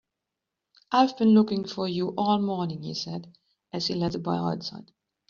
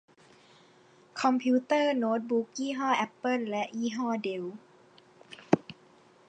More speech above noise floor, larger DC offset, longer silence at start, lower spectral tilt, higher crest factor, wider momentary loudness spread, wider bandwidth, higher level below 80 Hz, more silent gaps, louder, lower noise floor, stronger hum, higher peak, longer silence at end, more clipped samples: first, 60 dB vs 30 dB; neither; second, 0.9 s vs 1.15 s; about the same, -5.5 dB/octave vs -5 dB/octave; second, 20 dB vs 26 dB; about the same, 15 LU vs 17 LU; second, 7.2 kHz vs 9 kHz; first, -64 dBFS vs -82 dBFS; neither; first, -26 LUFS vs -30 LUFS; first, -86 dBFS vs -60 dBFS; neither; second, -8 dBFS vs -4 dBFS; about the same, 0.45 s vs 0.55 s; neither